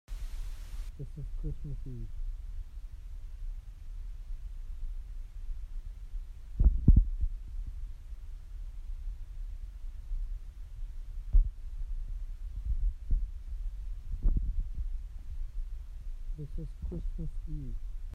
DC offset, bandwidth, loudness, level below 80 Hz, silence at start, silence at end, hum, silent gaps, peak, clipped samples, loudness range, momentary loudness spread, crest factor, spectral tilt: under 0.1%; 3 kHz; -39 LUFS; -34 dBFS; 0.1 s; 0 s; none; none; -10 dBFS; under 0.1%; 13 LU; 15 LU; 24 dB; -8.5 dB/octave